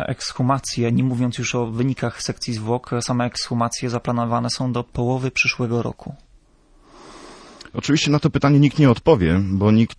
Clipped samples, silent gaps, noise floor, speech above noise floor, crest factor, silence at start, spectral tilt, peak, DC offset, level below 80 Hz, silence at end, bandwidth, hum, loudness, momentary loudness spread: under 0.1%; none; -54 dBFS; 34 dB; 18 dB; 0 s; -6 dB/octave; -2 dBFS; under 0.1%; -44 dBFS; 0.05 s; 11 kHz; none; -20 LUFS; 10 LU